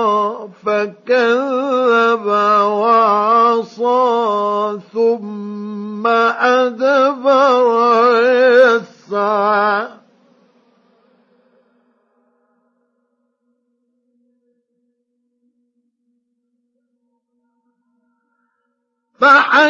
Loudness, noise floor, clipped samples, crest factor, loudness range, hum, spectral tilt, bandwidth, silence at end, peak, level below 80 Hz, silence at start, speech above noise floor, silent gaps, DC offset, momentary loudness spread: -14 LUFS; -71 dBFS; under 0.1%; 16 dB; 8 LU; none; -4.5 dB/octave; 7.4 kHz; 0 s; 0 dBFS; -80 dBFS; 0 s; 58 dB; none; under 0.1%; 11 LU